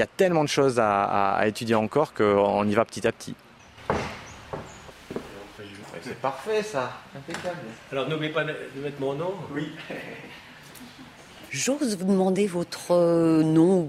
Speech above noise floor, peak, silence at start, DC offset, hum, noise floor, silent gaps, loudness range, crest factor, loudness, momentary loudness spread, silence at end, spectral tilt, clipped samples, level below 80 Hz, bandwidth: 22 dB; -4 dBFS; 0 s; under 0.1%; none; -46 dBFS; none; 10 LU; 20 dB; -25 LUFS; 21 LU; 0 s; -5.5 dB/octave; under 0.1%; -58 dBFS; 15 kHz